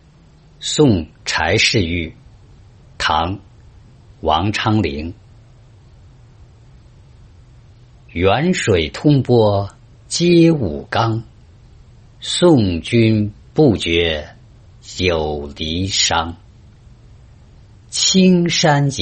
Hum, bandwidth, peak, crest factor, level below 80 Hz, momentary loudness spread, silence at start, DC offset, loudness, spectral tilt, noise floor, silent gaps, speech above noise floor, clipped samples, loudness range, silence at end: none; 8.8 kHz; -2 dBFS; 16 dB; -42 dBFS; 12 LU; 0.6 s; under 0.1%; -16 LUFS; -5 dB/octave; -47 dBFS; none; 32 dB; under 0.1%; 7 LU; 0 s